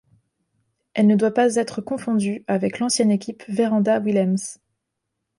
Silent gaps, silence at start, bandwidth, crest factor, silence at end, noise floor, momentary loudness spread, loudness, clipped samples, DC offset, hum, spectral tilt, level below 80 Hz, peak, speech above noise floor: none; 0.95 s; 11.5 kHz; 16 dB; 0.85 s; -79 dBFS; 9 LU; -21 LUFS; under 0.1%; under 0.1%; none; -5.5 dB/octave; -66 dBFS; -6 dBFS; 59 dB